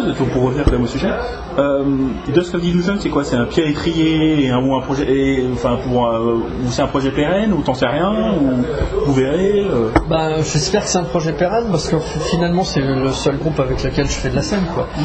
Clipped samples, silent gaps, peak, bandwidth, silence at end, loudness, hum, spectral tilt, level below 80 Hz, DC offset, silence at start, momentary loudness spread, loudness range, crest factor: under 0.1%; none; 0 dBFS; 8.8 kHz; 0 s; -17 LUFS; none; -6 dB/octave; -30 dBFS; under 0.1%; 0 s; 3 LU; 1 LU; 16 dB